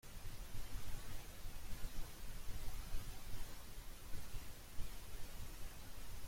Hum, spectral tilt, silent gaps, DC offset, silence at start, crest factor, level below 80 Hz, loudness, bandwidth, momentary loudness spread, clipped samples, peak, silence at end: none; -3.5 dB/octave; none; under 0.1%; 0.05 s; 14 dB; -50 dBFS; -54 LUFS; 16.5 kHz; 3 LU; under 0.1%; -28 dBFS; 0 s